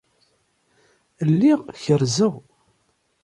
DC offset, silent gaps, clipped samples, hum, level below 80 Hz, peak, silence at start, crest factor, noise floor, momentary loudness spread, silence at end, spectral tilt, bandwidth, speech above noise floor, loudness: under 0.1%; none; under 0.1%; none; -62 dBFS; -6 dBFS; 1.2 s; 16 dB; -67 dBFS; 8 LU; 0.85 s; -6.5 dB/octave; 11.5 kHz; 49 dB; -20 LUFS